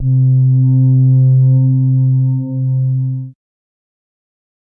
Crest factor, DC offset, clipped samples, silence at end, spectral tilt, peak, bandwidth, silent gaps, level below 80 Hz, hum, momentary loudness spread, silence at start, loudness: 8 dB; under 0.1%; under 0.1%; 1.4 s; -17.5 dB/octave; -4 dBFS; 1 kHz; none; -48 dBFS; none; 8 LU; 0 s; -12 LUFS